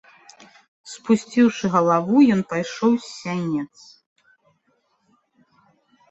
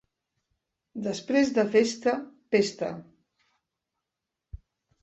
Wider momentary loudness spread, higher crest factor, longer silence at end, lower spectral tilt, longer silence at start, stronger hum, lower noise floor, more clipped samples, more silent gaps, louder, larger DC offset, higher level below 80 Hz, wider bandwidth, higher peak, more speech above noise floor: about the same, 13 LU vs 12 LU; about the same, 18 dB vs 20 dB; first, 2.45 s vs 0.45 s; first, -6 dB/octave vs -4.5 dB/octave; about the same, 0.85 s vs 0.95 s; neither; second, -67 dBFS vs -87 dBFS; neither; neither; first, -20 LUFS vs -27 LUFS; neither; second, -66 dBFS vs -58 dBFS; about the same, 8.2 kHz vs 8.4 kHz; first, -4 dBFS vs -8 dBFS; second, 47 dB vs 61 dB